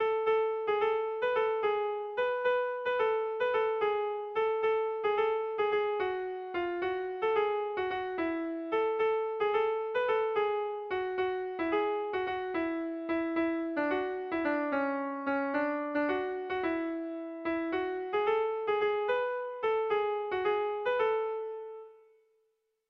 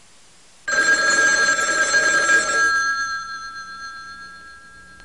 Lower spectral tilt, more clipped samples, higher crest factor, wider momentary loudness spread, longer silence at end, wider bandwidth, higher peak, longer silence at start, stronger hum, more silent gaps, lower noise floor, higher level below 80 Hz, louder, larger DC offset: first, -6 dB/octave vs 0.5 dB/octave; neither; about the same, 14 dB vs 16 dB; second, 5 LU vs 19 LU; first, 0.95 s vs 0.25 s; second, 5.4 kHz vs 11.5 kHz; second, -18 dBFS vs -4 dBFS; second, 0 s vs 0.65 s; neither; neither; first, -77 dBFS vs -51 dBFS; second, -68 dBFS vs -56 dBFS; second, -32 LUFS vs -17 LUFS; second, under 0.1% vs 0.3%